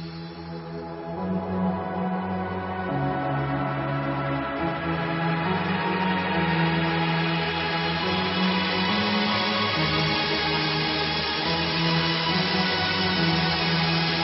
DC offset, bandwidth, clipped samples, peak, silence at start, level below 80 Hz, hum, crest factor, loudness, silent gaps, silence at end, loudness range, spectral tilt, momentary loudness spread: under 0.1%; 5.8 kHz; under 0.1%; -10 dBFS; 0 s; -46 dBFS; none; 16 dB; -24 LUFS; none; 0 s; 5 LU; -9 dB/octave; 7 LU